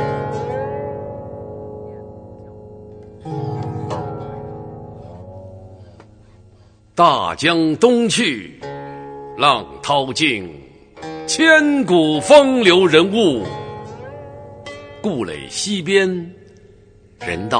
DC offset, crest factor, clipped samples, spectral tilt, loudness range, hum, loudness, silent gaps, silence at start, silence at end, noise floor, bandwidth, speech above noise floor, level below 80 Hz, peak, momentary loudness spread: under 0.1%; 18 dB; under 0.1%; -4 dB/octave; 16 LU; none; -16 LUFS; none; 0 s; 0 s; -48 dBFS; 9.6 kHz; 34 dB; -50 dBFS; 0 dBFS; 25 LU